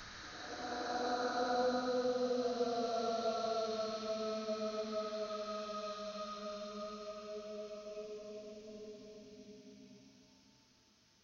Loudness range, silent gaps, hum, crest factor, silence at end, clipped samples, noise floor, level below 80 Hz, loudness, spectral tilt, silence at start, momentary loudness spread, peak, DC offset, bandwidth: 14 LU; none; none; 16 dB; 0.95 s; under 0.1%; -70 dBFS; -72 dBFS; -39 LUFS; -3.5 dB/octave; 0 s; 17 LU; -24 dBFS; under 0.1%; 7.4 kHz